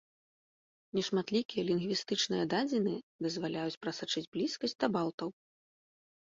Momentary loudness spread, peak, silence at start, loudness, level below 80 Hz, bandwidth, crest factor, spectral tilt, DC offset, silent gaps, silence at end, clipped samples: 6 LU; -16 dBFS; 0.95 s; -34 LUFS; -74 dBFS; 7.8 kHz; 20 dB; -4.5 dB/octave; under 0.1%; 1.45-1.49 s, 3.03-3.19 s, 3.77-3.81 s, 4.27-4.32 s, 5.14-5.18 s; 0.95 s; under 0.1%